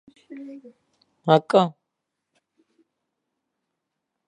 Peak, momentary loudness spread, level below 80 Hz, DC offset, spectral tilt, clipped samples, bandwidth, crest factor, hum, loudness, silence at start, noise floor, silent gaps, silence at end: -2 dBFS; 26 LU; -80 dBFS; under 0.1%; -7 dB/octave; under 0.1%; 10.5 kHz; 26 dB; none; -21 LUFS; 0.3 s; -81 dBFS; none; 2.55 s